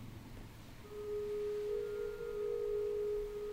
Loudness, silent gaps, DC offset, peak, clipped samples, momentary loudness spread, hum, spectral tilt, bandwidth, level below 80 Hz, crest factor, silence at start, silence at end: -40 LUFS; none; under 0.1%; -30 dBFS; under 0.1%; 15 LU; none; -6 dB/octave; 16 kHz; -56 dBFS; 10 dB; 0 s; 0 s